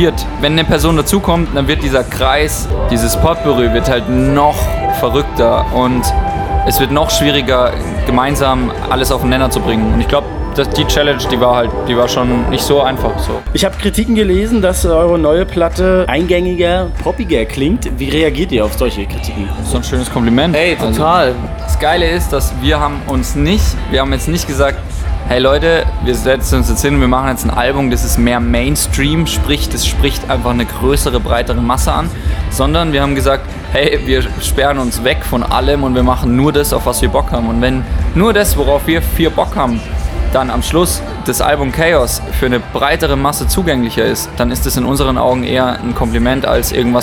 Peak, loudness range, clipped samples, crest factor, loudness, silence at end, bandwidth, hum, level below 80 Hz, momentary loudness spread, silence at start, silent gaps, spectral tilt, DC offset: 0 dBFS; 2 LU; under 0.1%; 12 dB; -13 LUFS; 0 s; 20 kHz; none; -20 dBFS; 5 LU; 0 s; none; -5 dB/octave; under 0.1%